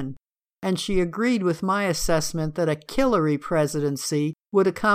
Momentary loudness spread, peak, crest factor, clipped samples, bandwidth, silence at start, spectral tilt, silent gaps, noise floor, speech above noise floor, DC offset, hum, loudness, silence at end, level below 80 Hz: 5 LU; -8 dBFS; 16 dB; under 0.1%; 15.5 kHz; 0 s; -5 dB/octave; none; -51 dBFS; 29 dB; under 0.1%; none; -24 LUFS; 0 s; -42 dBFS